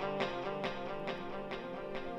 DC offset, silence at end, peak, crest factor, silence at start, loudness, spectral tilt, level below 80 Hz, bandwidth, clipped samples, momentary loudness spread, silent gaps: under 0.1%; 0 s; -20 dBFS; 20 dB; 0 s; -40 LUFS; -6 dB/octave; -56 dBFS; 11 kHz; under 0.1%; 5 LU; none